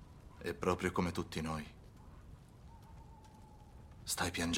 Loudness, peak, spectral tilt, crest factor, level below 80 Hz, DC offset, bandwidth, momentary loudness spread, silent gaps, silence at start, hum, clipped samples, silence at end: -39 LUFS; -18 dBFS; -4 dB/octave; 24 dB; -58 dBFS; under 0.1%; 16 kHz; 22 LU; none; 0 s; none; under 0.1%; 0 s